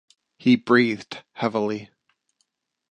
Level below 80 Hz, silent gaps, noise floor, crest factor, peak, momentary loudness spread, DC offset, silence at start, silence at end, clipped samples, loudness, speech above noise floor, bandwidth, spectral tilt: -70 dBFS; none; -74 dBFS; 20 dB; -4 dBFS; 15 LU; under 0.1%; 0.45 s; 1.05 s; under 0.1%; -22 LUFS; 52 dB; 8.4 kHz; -6.5 dB/octave